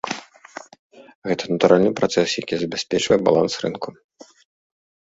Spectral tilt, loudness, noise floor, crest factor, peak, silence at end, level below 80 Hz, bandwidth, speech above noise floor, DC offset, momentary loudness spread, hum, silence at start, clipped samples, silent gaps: -4.5 dB/octave; -20 LUFS; -41 dBFS; 20 dB; -2 dBFS; 1.15 s; -58 dBFS; 8 kHz; 22 dB; under 0.1%; 21 LU; none; 0.05 s; under 0.1%; 0.79-0.90 s, 1.15-1.22 s